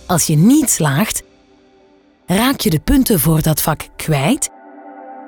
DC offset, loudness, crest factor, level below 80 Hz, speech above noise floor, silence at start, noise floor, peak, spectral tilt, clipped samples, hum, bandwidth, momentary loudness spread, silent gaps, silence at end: under 0.1%; -15 LUFS; 14 dB; -34 dBFS; 36 dB; 0.1 s; -50 dBFS; -2 dBFS; -4.5 dB/octave; under 0.1%; none; over 20 kHz; 11 LU; none; 0 s